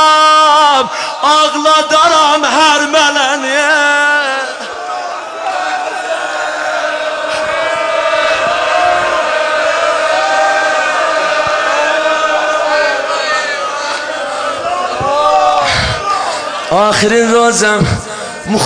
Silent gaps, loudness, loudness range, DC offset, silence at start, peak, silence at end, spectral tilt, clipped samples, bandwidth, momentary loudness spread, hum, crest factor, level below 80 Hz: none; -11 LUFS; 6 LU; under 0.1%; 0 s; 0 dBFS; 0 s; -2.5 dB/octave; under 0.1%; 10.5 kHz; 9 LU; none; 12 dB; -40 dBFS